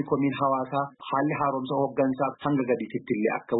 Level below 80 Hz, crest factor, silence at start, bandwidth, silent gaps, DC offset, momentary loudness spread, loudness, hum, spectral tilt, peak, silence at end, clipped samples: -66 dBFS; 14 dB; 0 s; 4.1 kHz; none; under 0.1%; 4 LU; -27 LUFS; none; -11.5 dB/octave; -12 dBFS; 0 s; under 0.1%